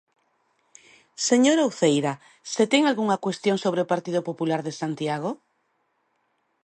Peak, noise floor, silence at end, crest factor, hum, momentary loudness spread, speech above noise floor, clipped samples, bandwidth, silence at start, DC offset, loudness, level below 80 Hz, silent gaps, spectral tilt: -6 dBFS; -71 dBFS; 1.3 s; 18 dB; none; 11 LU; 49 dB; under 0.1%; 11 kHz; 1.2 s; under 0.1%; -24 LUFS; -76 dBFS; none; -4.5 dB/octave